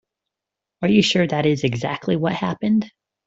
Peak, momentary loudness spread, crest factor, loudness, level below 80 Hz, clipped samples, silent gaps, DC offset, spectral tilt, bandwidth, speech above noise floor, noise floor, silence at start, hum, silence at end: -4 dBFS; 8 LU; 18 dB; -20 LUFS; -58 dBFS; under 0.1%; none; under 0.1%; -6 dB/octave; 8 kHz; 66 dB; -85 dBFS; 0.8 s; none; 0.4 s